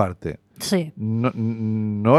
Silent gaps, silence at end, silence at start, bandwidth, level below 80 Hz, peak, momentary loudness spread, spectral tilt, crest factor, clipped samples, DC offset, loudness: none; 0 s; 0 s; 14.5 kHz; -54 dBFS; -2 dBFS; 8 LU; -6.5 dB/octave; 18 dB; under 0.1%; under 0.1%; -24 LUFS